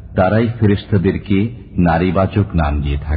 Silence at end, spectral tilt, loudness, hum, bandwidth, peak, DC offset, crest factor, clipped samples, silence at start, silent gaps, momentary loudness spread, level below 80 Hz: 0 s; -13 dB/octave; -16 LUFS; none; 5 kHz; 0 dBFS; under 0.1%; 14 dB; under 0.1%; 0 s; none; 4 LU; -26 dBFS